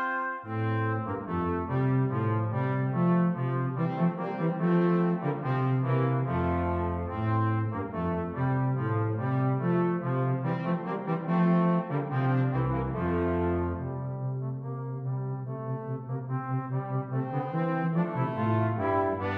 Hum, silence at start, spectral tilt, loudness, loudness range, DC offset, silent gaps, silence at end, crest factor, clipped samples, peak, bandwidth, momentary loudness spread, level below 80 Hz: none; 0 s; -11 dB/octave; -29 LUFS; 5 LU; under 0.1%; none; 0 s; 14 dB; under 0.1%; -14 dBFS; 4.4 kHz; 8 LU; -52 dBFS